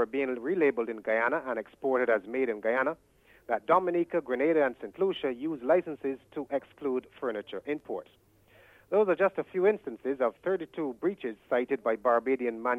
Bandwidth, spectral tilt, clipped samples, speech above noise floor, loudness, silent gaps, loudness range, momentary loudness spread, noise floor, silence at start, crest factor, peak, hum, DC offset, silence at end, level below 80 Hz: 4.7 kHz; -7.5 dB/octave; under 0.1%; 30 dB; -30 LUFS; none; 4 LU; 10 LU; -60 dBFS; 0 s; 18 dB; -10 dBFS; none; under 0.1%; 0 s; -72 dBFS